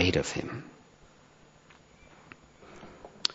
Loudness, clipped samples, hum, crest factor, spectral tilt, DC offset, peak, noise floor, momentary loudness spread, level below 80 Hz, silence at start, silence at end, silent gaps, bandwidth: -32 LUFS; under 0.1%; none; 32 dB; -3.5 dB/octave; under 0.1%; -4 dBFS; -58 dBFS; 26 LU; -56 dBFS; 0 s; 0 s; none; 7.6 kHz